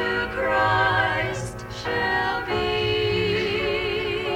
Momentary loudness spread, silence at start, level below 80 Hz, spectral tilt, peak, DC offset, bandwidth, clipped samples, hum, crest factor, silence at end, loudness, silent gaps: 8 LU; 0 s; -42 dBFS; -5 dB/octave; -8 dBFS; under 0.1%; 17 kHz; under 0.1%; none; 14 dB; 0 s; -23 LUFS; none